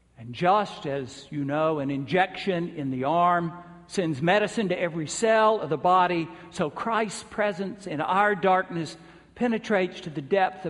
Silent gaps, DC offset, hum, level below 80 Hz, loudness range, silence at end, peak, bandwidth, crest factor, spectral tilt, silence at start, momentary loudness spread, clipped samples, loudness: none; under 0.1%; none; -64 dBFS; 2 LU; 0 s; -8 dBFS; 11.5 kHz; 18 dB; -5.5 dB/octave; 0.2 s; 12 LU; under 0.1%; -25 LUFS